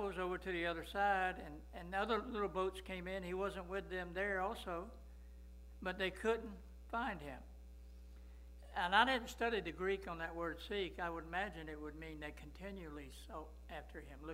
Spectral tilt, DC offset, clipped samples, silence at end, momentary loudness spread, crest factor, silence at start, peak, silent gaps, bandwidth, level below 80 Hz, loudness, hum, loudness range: -5 dB/octave; under 0.1%; under 0.1%; 0 s; 22 LU; 26 dB; 0 s; -16 dBFS; none; 16 kHz; -56 dBFS; -41 LUFS; none; 6 LU